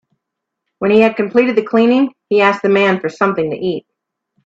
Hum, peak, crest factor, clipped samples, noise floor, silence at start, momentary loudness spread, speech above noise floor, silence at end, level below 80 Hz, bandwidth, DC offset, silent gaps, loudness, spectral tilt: none; 0 dBFS; 14 dB; under 0.1%; -78 dBFS; 0.8 s; 9 LU; 65 dB; 0.65 s; -58 dBFS; 7.8 kHz; under 0.1%; none; -14 LUFS; -7 dB/octave